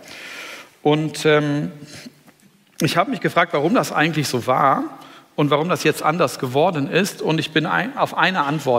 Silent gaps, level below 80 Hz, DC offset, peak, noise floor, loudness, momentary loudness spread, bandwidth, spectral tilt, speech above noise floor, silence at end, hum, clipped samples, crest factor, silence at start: none; -66 dBFS; under 0.1%; -2 dBFS; -53 dBFS; -19 LUFS; 14 LU; 16 kHz; -5 dB/octave; 34 dB; 0 s; none; under 0.1%; 18 dB; 0.05 s